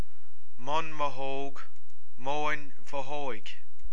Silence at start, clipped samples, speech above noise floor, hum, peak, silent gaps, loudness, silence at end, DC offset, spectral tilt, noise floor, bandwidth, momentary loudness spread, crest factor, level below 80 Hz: 0.6 s; under 0.1%; 29 dB; none; -12 dBFS; none; -35 LUFS; 0 s; 10%; -5 dB/octave; -64 dBFS; 11 kHz; 15 LU; 20 dB; -56 dBFS